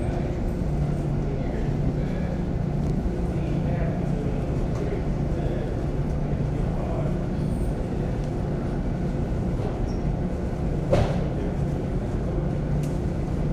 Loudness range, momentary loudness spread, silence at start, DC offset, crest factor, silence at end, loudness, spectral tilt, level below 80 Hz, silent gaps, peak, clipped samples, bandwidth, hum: 1 LU; 2 LU; 0 s; under 0.1%; 18 dB; 0 s; -27 LUFS; -8.5 dB/octave; -30 dBFS; none; -8 dBFS; under 0.1%; 10 kHz; none